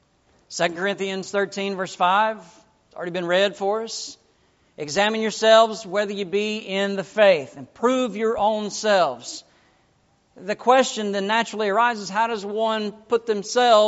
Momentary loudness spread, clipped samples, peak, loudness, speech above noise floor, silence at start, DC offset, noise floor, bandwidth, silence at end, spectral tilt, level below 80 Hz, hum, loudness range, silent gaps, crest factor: 13 LU; under 0.1%; -2 dBFS; -22 LUFS; 41 dB; 0.5 s; under 0.1%; -63 dBFS; 8 kHz; 0 s; -2 dB/octave; -66 dBFS; none; 4 LU; none; 20 dB